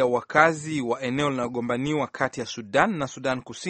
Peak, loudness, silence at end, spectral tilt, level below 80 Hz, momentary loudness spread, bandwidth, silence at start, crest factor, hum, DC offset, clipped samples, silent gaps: -2 dBFS; -25 LUFS; 0 s; -5 dB/octave; -58 dBFS; 9 LU; 8.8 kHz; 0 s; 22 dB; none; under 0.1%; under 0.1%; none